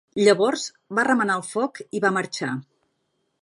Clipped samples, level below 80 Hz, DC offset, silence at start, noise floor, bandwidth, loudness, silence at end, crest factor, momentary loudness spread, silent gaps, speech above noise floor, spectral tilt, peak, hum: under 0.1%; -74 dBFS; under 0.1%; 0.15 s; -73 dBFS; 11.5 kHz; -23 LUFS; 0.8 s; 20 dB; 11 LU; none; 51 dB; -4 dB/octave; -4 dBFS; none